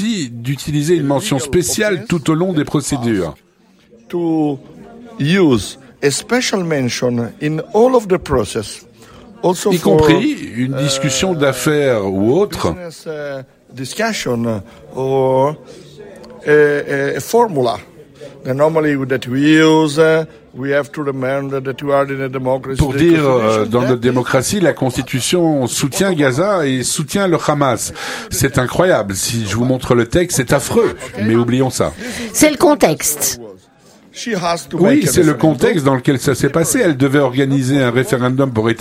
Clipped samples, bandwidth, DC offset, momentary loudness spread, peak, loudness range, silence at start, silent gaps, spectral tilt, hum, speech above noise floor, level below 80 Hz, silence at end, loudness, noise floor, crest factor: under 0.1%; 16 kHz; under 0.1%; 10 LU; 0 dBFS; 4 LU; 0 s; none; -5 dB/octave; none; 34 dB; -40 dBFS; 0 s; -15 LUFS; -48 dBFS; 16 dB